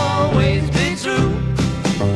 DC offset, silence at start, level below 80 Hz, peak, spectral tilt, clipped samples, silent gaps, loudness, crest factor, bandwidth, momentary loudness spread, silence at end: under 0.1%; 0 s; -30 dBFS; -2 dBFS; -6 dB/octave; under 0.1%; none; -18 LUFS; 14 dB; 12.5 kHz; 4 LU; 0 s